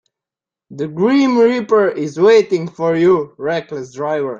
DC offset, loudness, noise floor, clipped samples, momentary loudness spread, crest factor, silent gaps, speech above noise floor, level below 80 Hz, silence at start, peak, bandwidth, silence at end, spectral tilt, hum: under 0.1%; -15 LUFS; -88 dBFS; under 0.1%; 12 LU; 14 dB; none; 73 dB; -60 dBFS; 0.7 s; -2 dBFS; 7.4 kHz; 0 s; -6.5 dB/octave; none